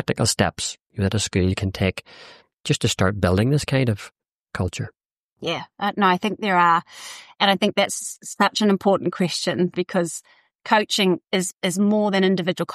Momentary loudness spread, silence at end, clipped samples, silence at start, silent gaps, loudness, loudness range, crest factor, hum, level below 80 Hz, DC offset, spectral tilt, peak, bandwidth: 13 LU; 0 s; under 0.1%; 0 s; 0.81-0.86 s, 4.32-4.45 s, 5.06-5.36 s, 10.55-10.59 s; -21 LUFS; 3 LU; 16 dB; none; -50 dBFS; under 0.1%; -4.5 dB/octave; -4 dBFS; 14 kHz